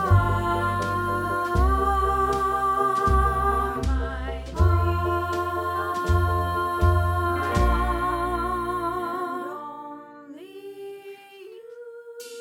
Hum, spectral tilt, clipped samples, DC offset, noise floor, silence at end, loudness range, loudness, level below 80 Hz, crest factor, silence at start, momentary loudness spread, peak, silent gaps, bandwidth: none; -7 dB/octave; under 0.1%; under 0.1%; -44 dBFS; 0 s; 9 LU; -24 LUFS; -30 dBFS; 16 dB; 0 s; 20 LU; -8 dBFS; none; 16.5 kHz